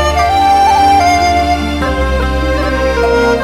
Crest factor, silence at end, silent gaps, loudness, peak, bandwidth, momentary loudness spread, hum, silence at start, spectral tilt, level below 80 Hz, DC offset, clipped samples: 10 dB; 0 s; none; -11 LUFS; 0 dBFS; 16 kHz; 6 LU; none; 0 s; -5 dB/octave; -20 dBFS; under 0.1%; under 0.1%